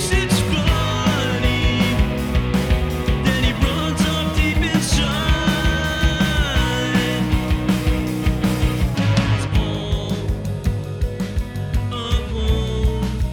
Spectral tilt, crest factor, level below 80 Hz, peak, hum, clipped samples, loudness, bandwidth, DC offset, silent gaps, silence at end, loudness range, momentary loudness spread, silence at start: -5 dB/octave; 16 dB; -24 dBFS; -4 dBFS; none; under 0.1%; -20 LUFS; 19 kHz; under 0.1%; none; 0 s; 4 LU; 6 LU; 0 s